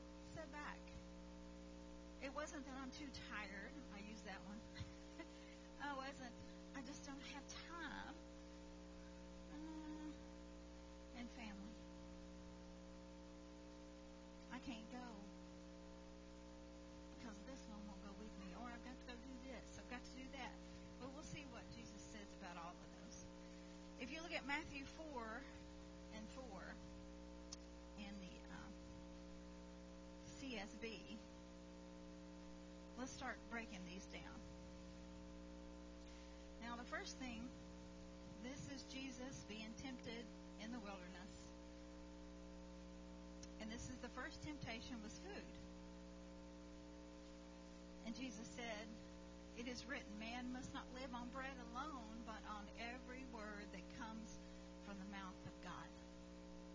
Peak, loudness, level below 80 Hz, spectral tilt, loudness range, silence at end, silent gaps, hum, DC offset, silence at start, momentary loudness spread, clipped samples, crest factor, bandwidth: -32 dBFS; -55 LUFS; -64 dBFS; -4.5 dB/octave; 6 LU; 0 s; none; 60 Hz at -60 dBFS; under 0.1%; 0 s; 9 LU; under 0.1%; 24 dB; 7.8 kHz